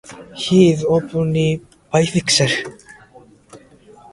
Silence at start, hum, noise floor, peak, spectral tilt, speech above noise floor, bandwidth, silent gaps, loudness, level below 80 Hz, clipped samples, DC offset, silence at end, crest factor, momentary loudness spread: 0.1 s; none; -46 dBFS; 0 dBFS; -5 dB/octave; 30 dB; 11.5 kHz; none; -17 LUFS; -50 dBFS; under 0.1%; under 0.1%; 0.55 s; 18 dB; 14 LU